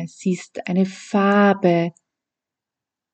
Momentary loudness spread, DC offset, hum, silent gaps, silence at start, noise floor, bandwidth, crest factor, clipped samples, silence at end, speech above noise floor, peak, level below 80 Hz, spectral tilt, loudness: 10 LU; under 0.1%; none; none; 0 s; -87 dBFS; 8.8 kHz; 16 dB; under 0.1%; 1.25 s; 68 dB; -4 dBFS; -74 dBFS; -7 dB/octave; -20 LUFS